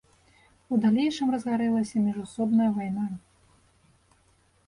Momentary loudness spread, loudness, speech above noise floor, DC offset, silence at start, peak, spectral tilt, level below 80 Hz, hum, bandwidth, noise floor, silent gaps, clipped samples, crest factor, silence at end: 8 LU; -26 LUFS; 39 dB; under 0.1%; 0.7 s; -14 dBFS; -6.5 dB/octave; -64 dBFS; none; 11 kHz; -64 dBFS; none; under 0.1%; 14 dB; 1.5 s